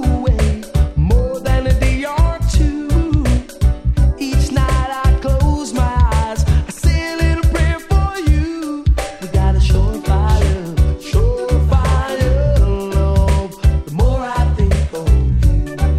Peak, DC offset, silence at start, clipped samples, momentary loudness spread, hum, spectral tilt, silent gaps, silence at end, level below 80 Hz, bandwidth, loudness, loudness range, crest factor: 0 dBFS; under 0.1%; 0 s; under 0.1%; 3 LU; none; -6.5 dB/octave; none; 0 s; -16 dBFS; 13.5 kHz; -16 LUFS; 1 LU; 12 dB